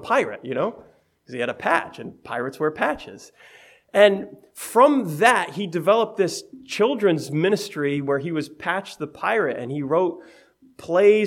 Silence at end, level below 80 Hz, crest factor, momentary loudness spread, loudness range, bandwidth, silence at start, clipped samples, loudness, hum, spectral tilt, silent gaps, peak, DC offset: 0 s; -66 dBFS; 22 dB; 16 LU; 6 LU; 17.5 kHz; 0 s; under 0.1%; -22 LUFS; none; -5 dB/octave; none; -2 dBFS; under 0.1%